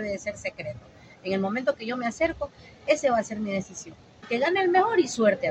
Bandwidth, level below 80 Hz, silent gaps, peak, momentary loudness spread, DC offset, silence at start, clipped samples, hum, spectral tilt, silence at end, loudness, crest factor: 8.8 kHz; -58 dBFS; none; -8 dBFS; 17 LU; under 0.1%; 0 s; under 0.1%; none; -4.5 dB/octave; 0 s; -26 LUFS; 18 dB